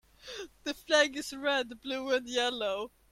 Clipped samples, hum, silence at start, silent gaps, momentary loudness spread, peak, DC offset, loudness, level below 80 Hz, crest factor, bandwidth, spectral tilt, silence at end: under 0.1%; none; 0.25 s; none; 14 LU; -12 dBFS; under 0.1%; -31 LUFS; -66 dBFS; 20 dB; 15.5 kHz; -1 dB/octave; 0.25 s